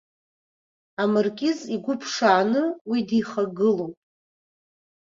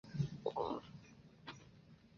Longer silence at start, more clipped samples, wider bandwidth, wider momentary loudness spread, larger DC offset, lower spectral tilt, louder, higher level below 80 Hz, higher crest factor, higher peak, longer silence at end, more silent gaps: first, 1 s vs 0.05 s; neither; about the same, 7.6 kHz vs 7 kHz; second, 8 LU vs 21 LU; neither; second, -5 dB/octave vs -6.5 dB/octave; first, -23 LUFS vs -44 LUFS; about the same, -70 dBFS vs -68 dBFS; about the same, 20 dB vs 20 dB; first, -4 dBFS vs -26 dBFS; first, 1.15 s vs 0 s; first, 2.81-2.85 s vs none